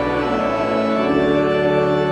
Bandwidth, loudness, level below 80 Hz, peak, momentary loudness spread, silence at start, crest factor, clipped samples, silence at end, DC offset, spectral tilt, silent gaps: 9.6 kHz; -18 LUFS; -42 dBFS; -4 dBFS; 3 LU; 0 s; 12 dB; under 0.1%; 0 s; under 0.1%; -7 dB/octave; none